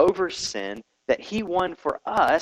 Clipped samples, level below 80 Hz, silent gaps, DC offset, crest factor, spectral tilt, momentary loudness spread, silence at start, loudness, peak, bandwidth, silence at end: under 0.1%; -54 dBFS; none; under 0.1%; 18 dB; -3.5 dB/octave; 11 LU; 0 s; -26 LUFS; -6 dBFS; 13.5 kHz; 0 s